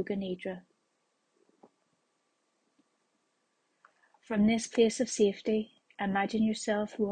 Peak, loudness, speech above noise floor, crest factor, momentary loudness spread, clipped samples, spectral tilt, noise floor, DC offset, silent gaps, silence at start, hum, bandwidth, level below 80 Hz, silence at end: -14 dBFS; -30 LUFS; 48 dB; 20 dB; 11 LU; under 0.1%; -5 dB/octave; -77 dBFS; under 0.1%; none; 0 s; none; 9.8 kHz; -68 dBFS; 0 s